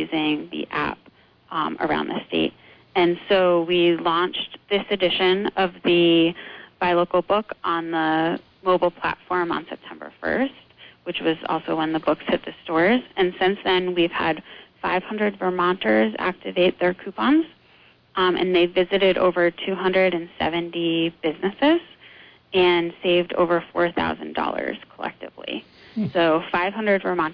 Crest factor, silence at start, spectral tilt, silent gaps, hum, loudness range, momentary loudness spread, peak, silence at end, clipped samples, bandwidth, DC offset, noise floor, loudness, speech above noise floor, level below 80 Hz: 14 dB; 0 s; -8 dB/octave; none; none; 4 LU; 10 LU; -8 dBFS; 0 s; under 0.1%; 5.2 kHz; under 0.1%; -54 dBFS; -22 LUFS; 33 dB; -56 dBFS